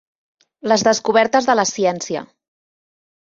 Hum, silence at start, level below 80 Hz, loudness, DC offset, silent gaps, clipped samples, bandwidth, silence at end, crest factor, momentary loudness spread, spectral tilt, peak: none; 0.65 s; -64 dBFS; -17 LUFS; under 0.1%; none; under 0.1%; 7.8 kHz; 1 s; 18 dB; 12 LU; -3 dB/octave; -2 dBFS